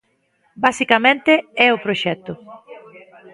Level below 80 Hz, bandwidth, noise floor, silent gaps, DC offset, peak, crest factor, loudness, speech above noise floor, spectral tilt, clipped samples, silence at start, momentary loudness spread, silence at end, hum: -62 dBFS; 11.5 kHz; -63 dBFS; none; under 0.1%; 0 dBFS; 20 dB; -16 LUFS; 46 dB; -4 dB/octave; under 0.1%; 0.6 s; 15 LU; 0.35 s; none